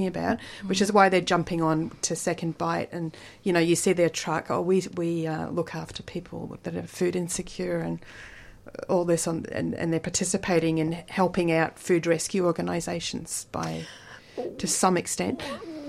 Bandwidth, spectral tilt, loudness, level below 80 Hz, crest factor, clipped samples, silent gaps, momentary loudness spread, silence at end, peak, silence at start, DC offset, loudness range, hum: 15.5 kHz; -4.5 dB/octave; -27 LUFS; -56 dBFS; 22 dB; under 0.1%; none; 13 LU; 0 s; -4 dBFS; 0 s; under 0.1%; 5 LU; none